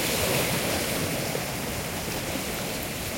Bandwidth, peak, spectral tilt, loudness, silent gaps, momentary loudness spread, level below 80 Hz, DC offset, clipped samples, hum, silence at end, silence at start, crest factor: 16.5 kHz; -12 dBFS; -3 dB/octave; -27 LUFS; none; 6 LU; -46 dBFS; under 0.1%; under 0.1%; none; 0 s; 0 s; 16 dB